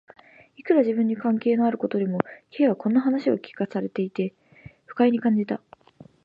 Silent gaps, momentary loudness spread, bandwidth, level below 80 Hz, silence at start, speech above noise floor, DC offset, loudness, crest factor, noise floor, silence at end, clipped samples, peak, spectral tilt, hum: none; 10 LU; 5.2 kHz; -68 dBFS; 0.65 s; 29 dB; under 0.1%; -24 LUFS; 22 dB; -52 dBFS; 0.65 s; under 0.1%; -4 dBFS; -9.5 dB/octave; none